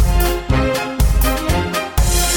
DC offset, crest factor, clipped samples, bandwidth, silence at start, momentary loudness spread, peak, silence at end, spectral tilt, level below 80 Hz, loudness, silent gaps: under 0.1%; 12 dB; under 0.1%; over 20 kHz; 0 s; 3 LU; -2 dBFS; 0 s; -4.5 dB/octave; -18 dBFS; -17 LUFS; none